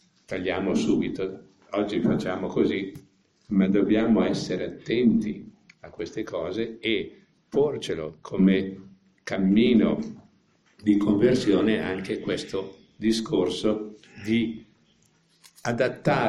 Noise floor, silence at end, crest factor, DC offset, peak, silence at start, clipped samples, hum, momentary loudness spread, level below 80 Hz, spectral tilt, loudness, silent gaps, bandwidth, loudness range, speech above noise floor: -64 dBFS; 0 s; 18 dB; under 0.1%; -8 dBFS; 0.3 s; under 0.1%; none; 14 LU; -56 dBFS; -6.5 dB/octave; -25 LUFS; none; 11.5 kHz; 5 LU; 39 dB